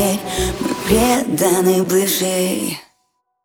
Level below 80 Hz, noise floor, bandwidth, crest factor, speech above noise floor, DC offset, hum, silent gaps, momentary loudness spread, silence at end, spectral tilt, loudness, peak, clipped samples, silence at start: -36 dBFS; -67 dBFS; over 20 kHz; 16 dB; 52 dB; under 0.1%; none; none; 8 LU; 0.65 s; -4 dB/octave; -17 LUFS; -2 dBFS; under 0.1%; 0 s